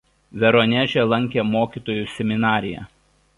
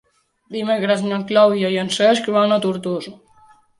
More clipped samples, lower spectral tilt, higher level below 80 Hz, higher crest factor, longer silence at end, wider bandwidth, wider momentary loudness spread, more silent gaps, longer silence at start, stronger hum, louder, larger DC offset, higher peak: neither; first, -7 dB/octave vs -5 dB/octave; first, -52 dBFS vs -66 dBFS; about the same, 18 dB vs 16 dB; second, 0.5 s vs 0.65 s; about the same, 11 kHz vs 11.5 kHz; about the same, 11 LU vs 12 LU; neither; second, 0.35 s vs 0.5 s; neither; about the same, -20 LUFS vs -18 LUFS; neither; about the same, -4 dBFS vs -2 dBFS